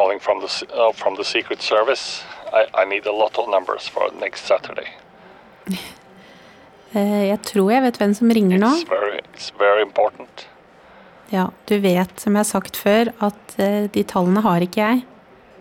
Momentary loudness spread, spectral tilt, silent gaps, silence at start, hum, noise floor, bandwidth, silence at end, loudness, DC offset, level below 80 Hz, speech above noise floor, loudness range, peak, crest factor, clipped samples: 12 LU; -5.5 dB/octave; none; 0 s; none; -47 dBFS; 17.5 kHz; 0.55 s; -19 LUFS; under 0.1%; -62 dBFS; 28 dB; 7 LU; -6 dBFS; 14 dB; under 0.1%